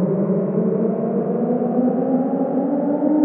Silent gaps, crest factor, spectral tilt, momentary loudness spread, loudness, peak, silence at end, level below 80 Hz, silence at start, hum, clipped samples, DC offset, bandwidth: none; 12 dB; -14.5 dB/octave; 2 LU; -20 LUFS; -6 dBFS; 0 s; -72 dBFS; 0 s; none; under 0.1%; under 0.1%; 2.9 kHz